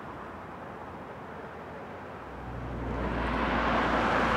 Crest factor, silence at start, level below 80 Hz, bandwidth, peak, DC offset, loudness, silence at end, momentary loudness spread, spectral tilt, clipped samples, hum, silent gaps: 18 dB; 0 s; -42 dBFS; 12 kHz; -14 dBFS; under 0.1%; -33 LUFS; 0 s; 16 LU; -6 dB/octave; under 0.1%; none; none